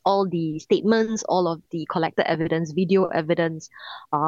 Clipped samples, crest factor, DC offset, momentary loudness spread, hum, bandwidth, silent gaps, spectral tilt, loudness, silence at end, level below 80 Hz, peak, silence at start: under 0.1%; 16 dB; under 0.1%; 8 LU; none; 7.6 kHz; none; -6 dB/octave; -23 LUFS; 0 s; -64 dBFS; -6 dBFS; 0.05 s